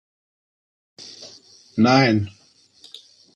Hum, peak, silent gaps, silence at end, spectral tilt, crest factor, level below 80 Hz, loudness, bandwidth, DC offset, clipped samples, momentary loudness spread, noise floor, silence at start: none; -4 dBFS; none; 1.05 s; -6 dB/octave; 20 dB; -64 dBFS; -18 LUFS; 8.8 kHz; under 0.1%; under 0.1%; 27 LU; -52 dBFS; 1.05 s